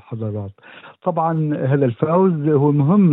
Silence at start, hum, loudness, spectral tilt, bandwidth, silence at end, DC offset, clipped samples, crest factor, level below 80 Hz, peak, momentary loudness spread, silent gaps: 0.1 s; none; -18 LUFS; -13 dB/octave; 3.9 kHz; 0 s; under 0.1%; under 0.1%; 12 dB; -68 dBFS; -4 dBFS; 12 LU; none